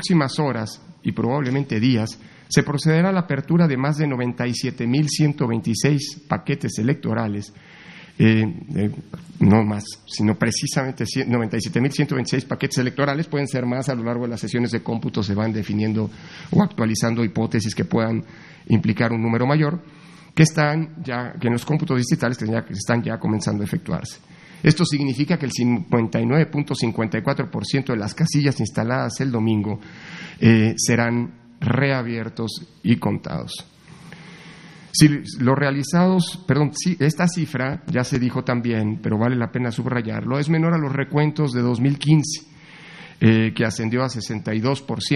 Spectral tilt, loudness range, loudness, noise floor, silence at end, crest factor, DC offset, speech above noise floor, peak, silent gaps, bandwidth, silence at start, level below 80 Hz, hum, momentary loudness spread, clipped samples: -6 dB/octave; 3 LU; -21 LUFS; -43 dBFS; 0 s; 20 dB; under 0.1%; 22 dB; 0 dBFS; none; 12.5 kHz; 0 s; -54 dBFS; none; 11 LU; under 0.1%